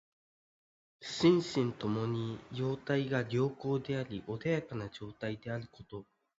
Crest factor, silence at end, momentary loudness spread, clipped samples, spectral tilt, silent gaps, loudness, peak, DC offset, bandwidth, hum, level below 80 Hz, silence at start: 20 dB; 0.35 s; 15 LU; under 0.1%; -6.5 dB/octave; none; -34 LUFS; -16 dBFS; under 0.1%; 8 kHz; none; -66 dBFS; 1 s